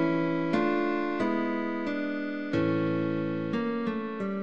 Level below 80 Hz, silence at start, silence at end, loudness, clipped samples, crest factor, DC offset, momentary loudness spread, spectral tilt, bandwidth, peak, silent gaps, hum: -64 dBFS; 0 s; 0 s; -29 LUFS; under 0.1%; 16 dB; 0.4%; 5 LU; -8 dB/octave; 7.2 kHz; -12 dBFS; none; none